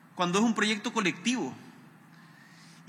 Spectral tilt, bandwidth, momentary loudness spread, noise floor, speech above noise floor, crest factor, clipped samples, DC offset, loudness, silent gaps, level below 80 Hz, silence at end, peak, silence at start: -4 dB/octave; 13.5 kHz; 10 LU; -54 dBFS; 26 dB; 18 dB; under 0.1%; under 0.1%; -28 LUFS; none; -88 dBFS; 1.15 s; -14 dBFS; 0.15 s